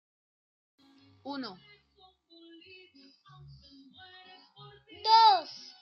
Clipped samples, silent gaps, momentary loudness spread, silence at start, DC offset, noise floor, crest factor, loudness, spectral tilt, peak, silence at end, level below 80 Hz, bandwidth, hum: under 0.1%; none; 30 LU; 1.25 s; under 0.1%; -64 dBFS; 22 dB; -25 LUFS; -3 dB/octave; -10 dBFS; 0.3 s; -74 dBFS; 6.6 kHz; none